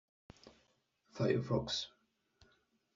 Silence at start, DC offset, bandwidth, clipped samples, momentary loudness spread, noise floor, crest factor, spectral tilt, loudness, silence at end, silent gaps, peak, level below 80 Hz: 0.45 s; under 0.1%; 7.6 kHz; under 0.1%; 14 LU; -77 dBFS; 22 dB; -5 dB/octave; -37 LUFS; 1.1 s; none; -20 dBFS; -66 dBFS